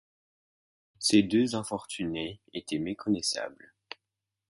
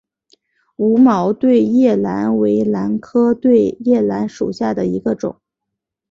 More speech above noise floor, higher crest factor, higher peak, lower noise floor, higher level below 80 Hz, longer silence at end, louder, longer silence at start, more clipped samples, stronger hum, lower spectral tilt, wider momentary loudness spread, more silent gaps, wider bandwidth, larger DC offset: second, 58 dB vs 65 dB; first, 22 dB vs 14 dB; second, -10 dBFS vs -2 dBFS; first, -87 dBFS vs -80 dBFS; second, -64 dBFS vs -54 dBFS; first, 0.95 s vs 0.8 s; second, -29 LUFS vs -15 LUFS; first, 1 s vs 0.8 s; neither; neither; second, -4 dB/octave vs -8.5 dB/octave; first, 22 LU vs 8 LU; neither; first, 11.5 kHz vs 7.2 kHz; neither